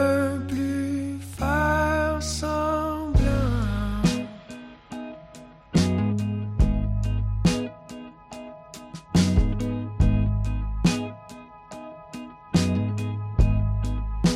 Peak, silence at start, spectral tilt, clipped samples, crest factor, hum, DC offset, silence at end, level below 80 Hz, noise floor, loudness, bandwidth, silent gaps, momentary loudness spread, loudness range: -10 dBFS; 0 s; -6.5 dB/octave; under 0.1%; 14 dB; none; under 0.1%; 0 s; -30 dBFS; -46 dBFS; -25 LUFS; 14 kHz; none; 19 LU; 3 LU